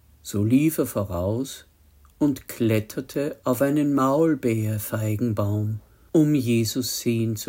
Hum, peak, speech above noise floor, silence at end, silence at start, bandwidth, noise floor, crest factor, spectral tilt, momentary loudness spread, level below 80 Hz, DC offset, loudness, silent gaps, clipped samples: none; -8 dBFS; 32 dB; 0 s; 0.25 s; 16.5 kHz; -55 dBFS; 16 dB; -6 dB/octave; 9 LU; -56 dBFS; under 0.1%; -24 LUFS; none; under 0.1%